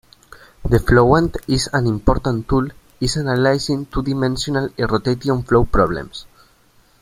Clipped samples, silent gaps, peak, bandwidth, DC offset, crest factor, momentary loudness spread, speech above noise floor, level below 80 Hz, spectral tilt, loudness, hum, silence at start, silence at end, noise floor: under 0.1%; none; -2 dBFS; 15 kHz; under 0.1%; 16 dB; 8 LU; 37 dB; -30 dBFS; -6 dB/octave; -18 LUFS; none; 0.3 s; 0.8 s; -54 dBFS